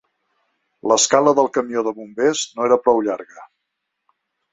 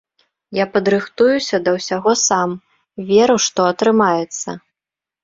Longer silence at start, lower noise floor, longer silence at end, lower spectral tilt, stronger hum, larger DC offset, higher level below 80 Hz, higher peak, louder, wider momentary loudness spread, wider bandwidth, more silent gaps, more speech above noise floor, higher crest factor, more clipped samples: first, 0.85 s vs 0.5 s; second, -77 dBFS vs -88 dBFS; first, 1.1 s vs 0.65 s; about the same, -2.5 dB/octave vs -3.5 dB/octave; neither; neither; second, -64 dBFS vs -58 dBFS; about the same, 0 dBFS vs -2 dBFS; about the same, -18 LUFS vs -16 LUFS; second, 11 LU vs 14 LU; about the same, 8.2 kHz vs 7.8 kHz; neither; second, 60 dB vs 72 dB; about the same, 20 dB vs 16 dB; neither